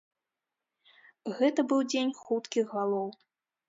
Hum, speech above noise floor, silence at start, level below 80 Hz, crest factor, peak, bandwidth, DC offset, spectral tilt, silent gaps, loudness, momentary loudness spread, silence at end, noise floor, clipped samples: none; 59 dB; 1.25 s; -84 dBFS; 18 dB; -14 dBFS; 7.8 kHz; under 0.1%; -4.5 dB/octave; none; -30 LUFS; 12 LU; 0.55 s; -89 dBFS; under 0.1%